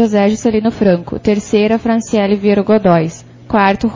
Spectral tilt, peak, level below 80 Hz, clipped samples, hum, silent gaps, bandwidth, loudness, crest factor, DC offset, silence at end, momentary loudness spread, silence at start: -6.5 dB/octave; 0 dBFS; -40 dBFS; under 0.1%; none; none; 7.6 kHz; -13 LUFS; 12 dB; under 0.1%; 0 s; 5 LU; 0 s